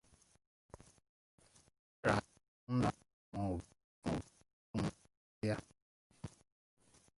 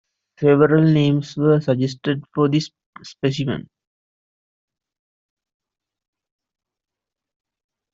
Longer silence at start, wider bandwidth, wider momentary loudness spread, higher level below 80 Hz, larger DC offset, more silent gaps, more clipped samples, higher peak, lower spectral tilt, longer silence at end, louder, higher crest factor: first, 2.05 s vs 0.4 s; first, 11.5 kHz vs 7.6 kHz; first, 25 LU vs 11 LU; about the same, -62 dBFS vs -60 dBFS; neither; first, 2.48-2.67 s, 3.13-3.32 s, 3.84-4.02 s, 4.53-4.74 s, 5.17-5.42 s, 5.82-6.10 s vs 2.86-2.93 s; neither; second, -16 dBFS vs -2 dBFS; about the same, -6.5 dB/octave vs -7.5 dB/octave; second, 0.9 s vs 4.3 s; second, -41 LUFS vs -19 LUFS; first, 28 dB vs 18 dB